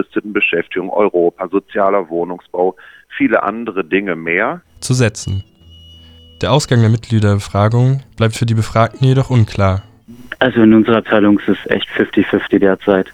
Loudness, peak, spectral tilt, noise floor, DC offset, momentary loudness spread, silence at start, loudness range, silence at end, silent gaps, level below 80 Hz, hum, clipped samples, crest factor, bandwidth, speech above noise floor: -15 LUFS; 0 dBFS; -6.5 dB/octave; -41 dBFS; under 0.1%; 9 LU; 0 s; 4 LU; 0 s; none; -44 dBFS; none; under 0.1%; 14 dB; 12.5 kHz; 27 dB